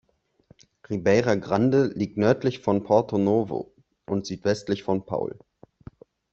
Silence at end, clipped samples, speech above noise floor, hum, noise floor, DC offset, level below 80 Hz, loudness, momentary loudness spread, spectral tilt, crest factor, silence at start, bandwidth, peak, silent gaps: 1 s; under 0.1%; 36 dB; none; -59 dBFS; under 0.1%; -60 dBFS; -24 LUFS; 10 LU; -7 dB/octave; 20 dB; 0.9 s; 8 kHz; -6 dBFS; none